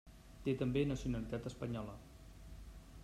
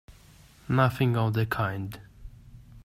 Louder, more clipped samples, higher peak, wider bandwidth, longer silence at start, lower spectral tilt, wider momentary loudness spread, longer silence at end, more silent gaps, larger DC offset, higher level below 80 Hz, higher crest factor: second, -40 LUFS vs -27 LUFS; neither; second, -24 dBFS vs -10 dBFS; second, 14.5 kHz vs 16 kHz; about the same, 0.05 s vs 0.1 s; about the same, -7 dB/octave vs -7.5 dB/octave; first, 21 LU vs 14 LU; about the same, 0 s vs 0.05 s; neither; neither; about the same, -54 dBFS vs -52 dBFS; about the same, 18 dB vs 20 dB